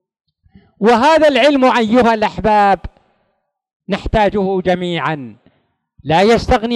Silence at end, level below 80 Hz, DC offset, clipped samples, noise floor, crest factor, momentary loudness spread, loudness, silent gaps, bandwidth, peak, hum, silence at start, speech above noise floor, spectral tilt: 0 s; -34 dBFS; under 0.1%; under 0.1%; -68 dBFS; 14 dB; 10 LU; -13 LUFS; 3.73-3.80 s; 12 kHz; 0 dBFS; none; 0.8 s; 55 dB; -6 dB/octave